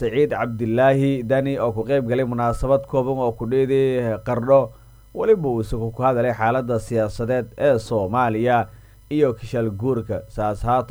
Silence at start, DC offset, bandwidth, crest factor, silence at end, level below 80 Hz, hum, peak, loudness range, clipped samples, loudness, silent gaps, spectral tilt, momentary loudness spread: 0 s; under 0.1%; over 20 kHz; 16 dB; 0.05 s; -40 dBFS; none; -4 dBFS; 1 LU; under 0.1%; -21 LUFS; none; -8 dB/octave; 7 LU